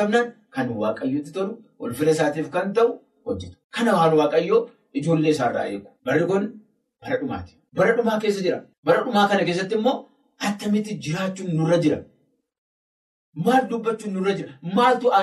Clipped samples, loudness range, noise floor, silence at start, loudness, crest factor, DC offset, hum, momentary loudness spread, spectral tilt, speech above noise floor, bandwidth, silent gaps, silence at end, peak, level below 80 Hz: under 0.1%; 3 LU; under -90 dBFS; 0 s; -23 LUFS; 16 dB; under 0.1%; none; 12 LU; -6 dB/octave; over 68 dB; 13 kHz; 3.64-3.70 s, 8.78-8.83 s, 12.58-13.33 s; 0 s; -6 dBFS; -62 dBFS